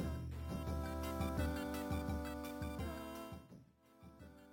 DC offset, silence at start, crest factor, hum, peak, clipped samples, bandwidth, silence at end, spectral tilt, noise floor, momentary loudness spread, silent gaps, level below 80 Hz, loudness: under 0.1%; 0 s; 16 dB; none; -26 dBFS; under 0.1%; 17 kHz; 0 s; -6.5 dB/octave; -64 dBFS; 19 LU; none; -50 dBFS; -44 LUFS